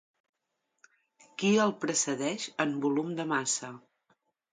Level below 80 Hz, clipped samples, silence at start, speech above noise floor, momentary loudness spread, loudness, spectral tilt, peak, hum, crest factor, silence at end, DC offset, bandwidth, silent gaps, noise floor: -78 dBFS; under 0.1%; 1.4 s; 52 dB; 7 LU; -30 LUFS; -3.5 dB/octave; -12 dBFS; none; 20 dB; 0.75 s; under 0.1%; 9.6 kHz; none; -82 dBFS